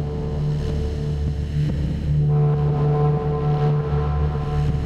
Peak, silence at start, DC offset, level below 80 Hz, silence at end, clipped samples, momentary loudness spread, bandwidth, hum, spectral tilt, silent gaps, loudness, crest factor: -10 dBFS; 0 s; under 0.1%; -28 dBFS; 0 s; under 0.1%; 6 LU; 6.6 kHz; none; -9.5 dB/octave; none; -22 LUFS; 10 dB